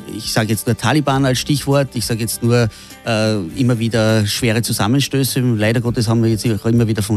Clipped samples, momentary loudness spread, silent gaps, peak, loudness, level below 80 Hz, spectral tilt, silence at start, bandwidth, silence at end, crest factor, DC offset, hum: under 0.1%; 4 LU; none; -2 dBFS; -16 LUFS; -42 dBFS; -5.5 dB/octave; 0 s; 15 kHz; 0 s; 14 dB; under 0.1%; none